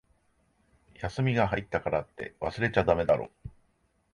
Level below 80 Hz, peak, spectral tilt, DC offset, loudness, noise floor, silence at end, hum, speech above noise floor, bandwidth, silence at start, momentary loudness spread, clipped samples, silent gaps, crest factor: -50 dBFS; -8 dBFS; -7.5 dB/octave; under 0.1%; -29 LUFS; -71 dBFS; 0.65 s; none; 42 dB; 11 kHz; 1 s; 17 LU; under 0.1%; none; 22 dB